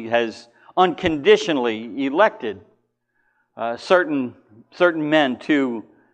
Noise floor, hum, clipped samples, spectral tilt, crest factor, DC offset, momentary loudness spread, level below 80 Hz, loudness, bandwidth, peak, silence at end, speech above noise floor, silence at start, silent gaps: -69 dBFS; none; under 0.1%; -5 dB/octave; 20 dB; under 0.1%; 13 LU; -56 dBFS; -20 LUFS; 9 kHz; -2 dBFS; 0.35 s; 49 dB; 0 s; none